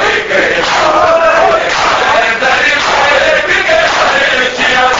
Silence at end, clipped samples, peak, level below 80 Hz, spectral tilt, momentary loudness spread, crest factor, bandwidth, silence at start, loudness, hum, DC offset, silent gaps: 0 s; under 0.1%; 0 dBFS; -38 dBFS; -2 dB/octave; 2 LU; 10 dB; 8 kHz; 0 s; -8 LUFS; none; under 0.1%; none